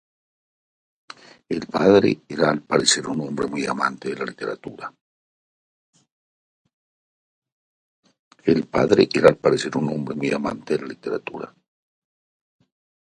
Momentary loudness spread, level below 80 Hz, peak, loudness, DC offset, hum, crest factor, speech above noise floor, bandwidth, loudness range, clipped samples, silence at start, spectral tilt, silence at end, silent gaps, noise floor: 15 LU; -58 dBFS; 0 dBFS; -21 LUFS; under 0.1%; none; 24 dB; over 69 dB; 11.5 kHz; 10 LU; under 0.1%; 1.5 s; -4.5 dB/octave; 1.6 s; 5.01-5.93 s, 6.12-6.65 s, 6.73-7.42 s, 7.52-8.03 s, 8.19-8.31 s; under -90 dBFS